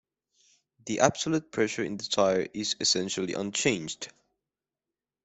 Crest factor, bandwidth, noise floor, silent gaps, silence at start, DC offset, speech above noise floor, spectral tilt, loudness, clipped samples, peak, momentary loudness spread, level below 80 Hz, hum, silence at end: 26 dB; 8.4 kHz; under -90 dBFS; none; 0.85 s; under 0.1%; over 62 dB; -3 dB/octave; -28 LUFS; under 0.1%; -4 dBFS; 11 LU; -68 dBFS; none; 1.15 s